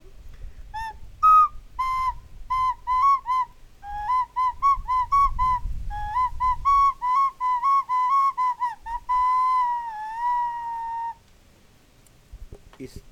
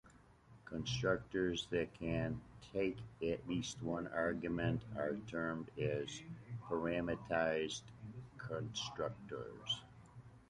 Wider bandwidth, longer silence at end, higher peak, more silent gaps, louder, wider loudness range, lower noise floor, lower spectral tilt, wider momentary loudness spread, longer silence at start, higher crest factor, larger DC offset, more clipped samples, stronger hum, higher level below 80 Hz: first, 15 kHz vs 11 kHz; about the same, 0.1 s vs 0.1 s; first, -10 dBFS vs -22 dBFS; neither; first, -23 LUFS vs -41 LUFS; first, 4 LU vs 1 LU; second, -55 dBFS vs -64 dBFS; about the same, -4 dB/octave vs -5 dB/octave; first, 15 LU vs 12 LU; about the same, 0.1 s vs 0.05 s; second, 14 dB vs 20 dB; neither; neither; neither; first, -40 dBFS vs -62 dBFS